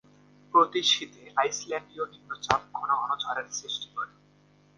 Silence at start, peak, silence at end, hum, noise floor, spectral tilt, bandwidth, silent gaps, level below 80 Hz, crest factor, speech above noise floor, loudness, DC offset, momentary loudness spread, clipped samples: 0.55 s; -2 dBFS; 0.7 s; 50 Hz at -60 dBFS; -61 dBFS; -1.5 dB/octave; 10.5 kHz; none; -64 dBFS; 26 dB; 31 dB; -28 LUFS; under 0.1%; 14 LU; under 0.1%